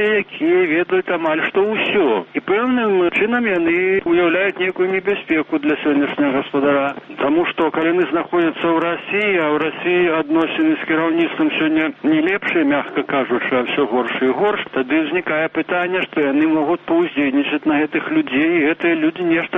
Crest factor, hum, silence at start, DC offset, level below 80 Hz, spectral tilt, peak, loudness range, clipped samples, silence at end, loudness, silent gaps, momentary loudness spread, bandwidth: 12 dB; none; 0 s; under 0.1%; -58 dBFS; -7.5 dB/octave; -6 dBFS; 1 LU; under 0.1%; 0 s; -17 LUFS; none; 3 LU; 3.9 kHz